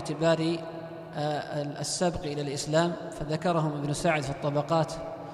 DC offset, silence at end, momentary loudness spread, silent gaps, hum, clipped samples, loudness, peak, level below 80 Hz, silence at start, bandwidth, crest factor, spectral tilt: under 0.1%; 0 s; 8 LU; none; none; under 0.1%; -29 LUFS; -12 dBFS; -54 dBFS; 0 s; 13 kHz; 18 dB; -5 dB/octave